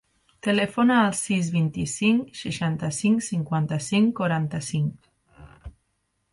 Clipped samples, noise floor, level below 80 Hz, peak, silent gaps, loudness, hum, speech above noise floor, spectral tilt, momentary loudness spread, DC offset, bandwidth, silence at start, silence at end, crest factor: under 0.1%; -73 dBFS; -54 dBFS; -8 dBFS; none; -24 LUFS; none; 50 dB; -5.5 dB/octave; 7 LU; under 0.1%; 11.5 kHz; 0.45 s; 0.65 s; 16 dB